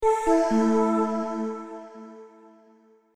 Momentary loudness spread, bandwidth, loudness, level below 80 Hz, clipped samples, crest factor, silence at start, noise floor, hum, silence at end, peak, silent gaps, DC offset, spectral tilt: 22 LU; 11.5 kHz; -24 LUFS; -52 dBFS; under 0.1%; 16 dB; 0 s; -58 dBFS; none; 0.9 s; -10 dBFS; none; under 0.1%; -6 dB/octave